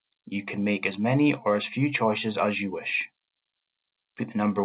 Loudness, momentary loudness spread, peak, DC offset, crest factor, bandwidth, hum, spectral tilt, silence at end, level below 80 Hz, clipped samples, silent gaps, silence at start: -26 LUFS; 11 LU; -10 dBFS; under 0.1%; 18 dB; 4 kHz; none; -10.5 dB/octave; 0 s; -68 dBFS; under 0.1%; none; 0.25 s